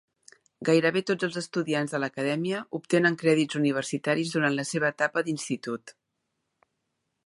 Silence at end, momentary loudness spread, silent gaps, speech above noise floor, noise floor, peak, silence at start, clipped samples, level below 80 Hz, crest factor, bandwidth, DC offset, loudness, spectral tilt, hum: 1.35 s; 9 LU; none; 54 dB; -80 dBFS; -10 dBFS; 0.6 s; under 0.1%; -76 dBFS; 18 dB; 11.5 kHz; under 0.1%; -27 LUFS; -5 dB/octave; none